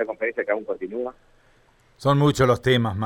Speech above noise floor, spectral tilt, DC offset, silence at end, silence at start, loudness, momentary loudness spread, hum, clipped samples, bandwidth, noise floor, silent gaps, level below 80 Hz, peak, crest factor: 36 dB; -6.5 dB/octave; under 0.1%; 0 s; 0 s; -22 LUFS; 12 LU; none; under 0.1%; 16 kHz; -58 dBFS; none; -50 dBFS; -8 dBFS; 16 dB